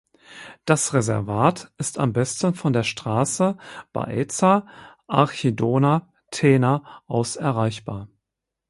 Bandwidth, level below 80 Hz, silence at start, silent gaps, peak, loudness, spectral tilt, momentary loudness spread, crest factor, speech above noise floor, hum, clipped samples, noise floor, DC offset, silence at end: 11.5 kHz; -56 dBFS; 0.3 s; none; 0 dBFS; -22 LUFS; -5.5 dB/octave; 14 LU; 22 dB; 62 dB; none; under 0.1%; -83 dBFS; under 0.1%; 0.65 s